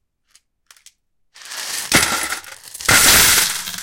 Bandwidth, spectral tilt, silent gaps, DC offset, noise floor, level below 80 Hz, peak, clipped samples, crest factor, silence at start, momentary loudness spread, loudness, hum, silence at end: 17 kHz; -0.5 dB/octave; none; under 0.1%; -58 dBFS; -42 dBFS; 0 dBFS; under 0.1%; 18 dB; 1.45 s; 19 LU; -13 LUFS; none; 0 s